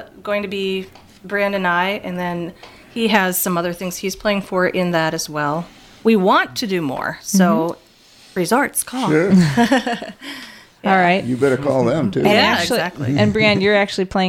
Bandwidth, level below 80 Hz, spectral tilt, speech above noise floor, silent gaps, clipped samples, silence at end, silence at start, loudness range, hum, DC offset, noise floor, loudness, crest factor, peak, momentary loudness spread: 17.5 kHz; -50 dBFS; -5 dB/octave; 30 dB; none; under 0.1%; 0 s; 0 s; 4 LU; none; under 0.1%; -47 dBFS; -18 LUFS; 18 dB; 0 dBFS; 13 LU